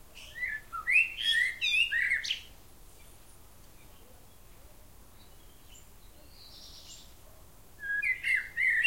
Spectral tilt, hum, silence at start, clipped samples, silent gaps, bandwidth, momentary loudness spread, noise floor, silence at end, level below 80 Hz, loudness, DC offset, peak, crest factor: 0.5 dB/octave; none; 0 s; under 0.1%; none; 16.5 kHz; 23 LU; -56 dBFS; 0 s; -58 dBFS; -28 LUFS; 0.2%; -14 dBFS; 20 dB